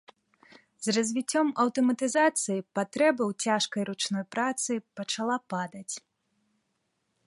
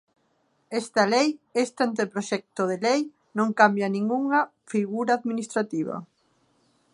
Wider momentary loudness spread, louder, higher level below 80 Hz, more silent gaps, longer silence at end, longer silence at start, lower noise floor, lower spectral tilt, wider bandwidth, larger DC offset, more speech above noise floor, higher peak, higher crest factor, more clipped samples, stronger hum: about the same, 10 LU vs 10 LU; second, -28 LUFS vs -25 LUFS; about the same, -80 dBFS vs -78 dBFS; neither; first, 1.3 s vs 0.9 s; about the same, 0.8 s vs 0.7 s; first, -78 dBFS vs -69 dBFS; about the same, -3.5 dB/octave vs -4.5 dB/octave; about the same, 11.5 kHz vs 11.5 kHz; neither; first, 50 dB vs 44 dB; second, -10 dBFS vs -4 dBFS; about the same, 20 dB vs 22 dB; neither; neither